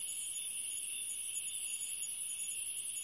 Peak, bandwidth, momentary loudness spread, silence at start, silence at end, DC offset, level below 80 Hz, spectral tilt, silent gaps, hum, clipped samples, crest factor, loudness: -26 dBFS; 11.5 kHz; 0 LU; 0 s; 0 s; under 0.1%; -82 dBFS; 3 dB/octave; none; none; under 0.1%; 14 dB; -37 LUFS